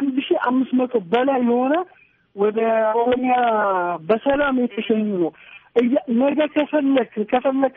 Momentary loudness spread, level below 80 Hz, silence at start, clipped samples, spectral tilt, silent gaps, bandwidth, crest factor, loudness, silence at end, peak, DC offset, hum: 4 LU; -58 dBFS; 0 s; under 0.1%; -4 dB/octave; none; 3.9 kHz; 14 dB; -20 LUFS; 0.05 s; -6 dBFS; under 0.1%; none